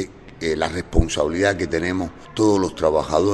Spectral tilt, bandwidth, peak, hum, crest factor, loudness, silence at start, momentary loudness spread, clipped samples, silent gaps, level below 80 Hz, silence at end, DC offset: -5.5 dB/octave; 11.5 kHz; -2 dBFS; none; 20 dB; -21 LUFS; 0 s; 9 LU; under 0.1%; none; -32 dBFS; 0 s; under 0.1%